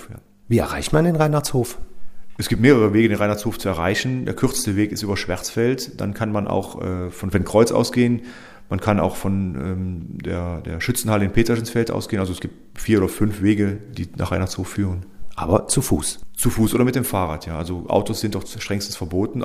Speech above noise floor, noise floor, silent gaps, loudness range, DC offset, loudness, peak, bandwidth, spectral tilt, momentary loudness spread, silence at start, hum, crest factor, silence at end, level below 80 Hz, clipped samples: 20 dB; -40 dBFS; none; 4 LU; under 0.1%; -21 LUFS; 0 dBFS; 15.5 kHz; -5.5 dB/octave; 11 LU; 0 s; none; 20 dB; 0 s; -38 dBFS; under 0.1%